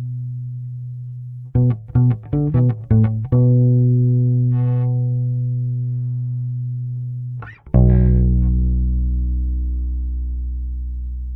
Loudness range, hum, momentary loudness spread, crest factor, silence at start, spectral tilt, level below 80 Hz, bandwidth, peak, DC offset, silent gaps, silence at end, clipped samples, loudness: 5 LU; none; 14 LU; 18 dB; 0 s; -13.5 dB/octave; -24 dBFS; 2.5 kHz; 0 dBFS; under 0.1%; none; 0 s; under 0.1%; -19 LUFS